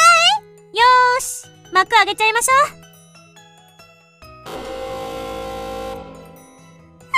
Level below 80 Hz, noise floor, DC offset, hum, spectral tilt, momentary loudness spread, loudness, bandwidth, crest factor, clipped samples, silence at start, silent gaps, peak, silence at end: -50 dBFS; -48 dBFS; under 0.1%; none; -0.5 dB/octave; 19 LU; -16 LUFS; 15.5 kHz; 18 dB; under 0.1%; 0 s; none; -2 dBFS; 0 s